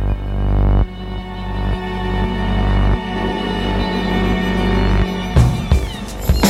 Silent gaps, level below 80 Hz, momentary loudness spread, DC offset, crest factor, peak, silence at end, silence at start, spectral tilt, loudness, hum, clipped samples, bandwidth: none; -20 dBFS; 8 LU; under 0.1%; 16 dB; -2 dBFS; 0 s; 0 s; -6 dB/octave; -19 LUFS; 50 Hz at -35 dBFS; under 0.1%; 13 kHz